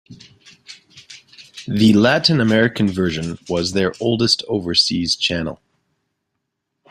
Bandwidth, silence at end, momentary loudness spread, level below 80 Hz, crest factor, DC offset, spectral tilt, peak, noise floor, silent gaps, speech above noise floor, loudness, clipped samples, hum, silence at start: 13 kHz; 1.35 s; 12 LU; -52 dBFS; 20 dB; under 0.1%; -4.5 dB/octave; 0 dBFS; -76 dBFS; none; 59 dB; -17 LUFS; under 0.1%; none; 0.1 s